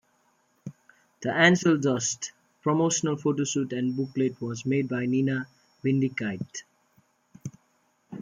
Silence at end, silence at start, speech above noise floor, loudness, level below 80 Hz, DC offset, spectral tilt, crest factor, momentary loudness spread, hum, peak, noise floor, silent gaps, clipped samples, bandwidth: 0 s; 0.65 s; 43 dB; -26 LUFS; -70 dBFS; under 0.1%; -4.5 dB/octave; 22 dB; 22 LU; none; -6 dBFS; -69 dBFS; none; under 0.1%; 9.6 kHz